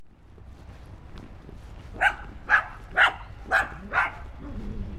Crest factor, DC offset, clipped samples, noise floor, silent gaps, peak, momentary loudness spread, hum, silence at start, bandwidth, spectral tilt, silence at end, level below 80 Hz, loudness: 22 dB; under 0.1%; under 0.1%; -47 dBFS; none; -6 dBFS; 24 LU; none; 0 s; 14 kHz; -4 dB/octave; 0 s; -42 dBFS; -24 LUFS